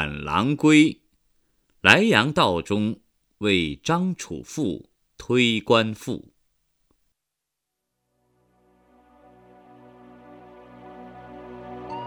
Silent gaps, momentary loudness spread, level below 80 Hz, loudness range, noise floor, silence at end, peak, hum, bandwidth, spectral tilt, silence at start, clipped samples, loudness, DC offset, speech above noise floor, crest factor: none; 26 LU; -54 dBFS; 13 LU; -83 dBFS; 0 s; 0 dBFS; none; 15 kHz; -5 dB/octave; 0 s; under 0.1%; -21 LUFS; under 0.1%; 62 dB; 26 dB